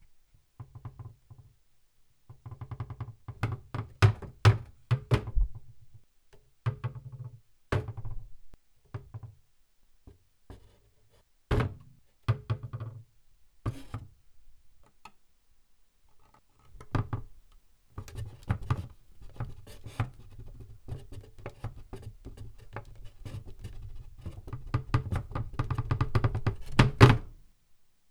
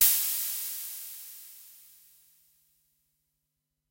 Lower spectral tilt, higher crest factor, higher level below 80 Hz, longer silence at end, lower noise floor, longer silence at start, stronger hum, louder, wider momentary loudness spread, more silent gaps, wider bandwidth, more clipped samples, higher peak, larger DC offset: first, -7 dB/octave vs 3.5 dB/octave; first, 32 dB vs 26 dB; first, -42 dBFS vs -74 dBFS; second, 0.75 s vs 2.15 s; second, -64 dBFS vs -83 dBFS; first, 0.6 s vs 0 s; neither; about the same, -31 LUFS vs -29 LUFS; about the same, 23 LU vs 24 LU; neither; second, 12 kHz vs 16 kHz; neither; first, -2 dBFS vs -8 dBFS; neither